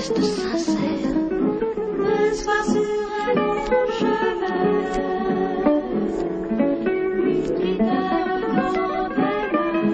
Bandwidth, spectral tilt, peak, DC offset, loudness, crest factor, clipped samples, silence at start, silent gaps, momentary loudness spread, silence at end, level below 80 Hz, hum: 9 kHz; -6 dB/octave; -6 dBFS; under 0.1%; -22 LUFS; 16 dB; under 0.1%; 0 s; none; 3 LU; 0 s; -44 dBFS; none